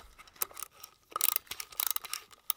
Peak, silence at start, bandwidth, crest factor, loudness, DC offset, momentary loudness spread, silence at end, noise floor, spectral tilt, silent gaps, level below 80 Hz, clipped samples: -6 dBFS; 0.2 s; 19 kHz; 30 dB; -33 LUFS; under 0.1%; 15 LU; 0.05 s; -55 dBFS; 2 dB/octave; none; -68 dBFS; under 0.1%